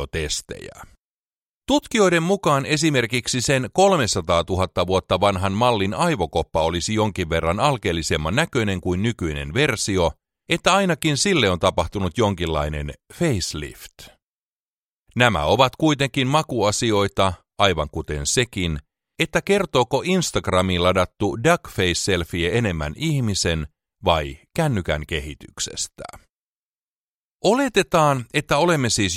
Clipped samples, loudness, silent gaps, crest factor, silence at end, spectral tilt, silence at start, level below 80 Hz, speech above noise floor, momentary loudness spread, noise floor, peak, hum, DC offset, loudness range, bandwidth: under 0.1%; -21 LUFS; 0.98-1.62 s, 14.24-15.03 s, 26.30-27.40 s; 20 dB; 0 s; -4.5 dB/octave; 0 s; -40 dBFS; over 69 dB; 9 LU; under -90 dBFS; 0 dBFS; none; under 0.1%; 5 LU; 16 kHz